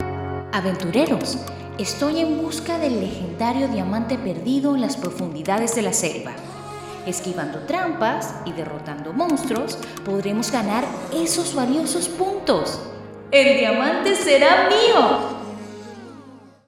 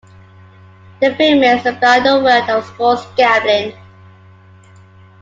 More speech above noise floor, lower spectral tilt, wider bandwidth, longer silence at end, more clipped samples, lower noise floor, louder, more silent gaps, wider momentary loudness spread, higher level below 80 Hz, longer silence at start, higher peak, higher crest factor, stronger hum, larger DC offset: second, 24 dB vs 30 dB; about the same, -4 dB/octave vs -4.5 dB/octave; first, 16.5 kHz vs 7.8 kHz; second, 0.2 s vs 1.5 s; neither; about the same, -44 dBFS vs -43 dBFS; second, -21 LUFS vs -13 LUFS; neither; first, 17 LU vs 7 LU; about the same, -56 dBFS vs -58 dBFS; second, 0 s vs 1 s; about the same, -2 dBFS vs 0 dBFS; first, 20 dB vs 14 dB; neither; neither